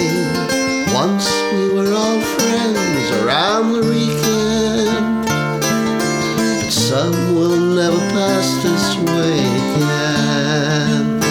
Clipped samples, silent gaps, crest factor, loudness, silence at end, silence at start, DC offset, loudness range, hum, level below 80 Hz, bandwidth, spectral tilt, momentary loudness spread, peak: under 0.1%; none; 14 dB; -16 LUFS; 0 s; 0 s; under 0.1%; 1 LU; none; -46 dBFS; 19 kHz; -4.5 dB/octave; 2 LU; -2 dBFS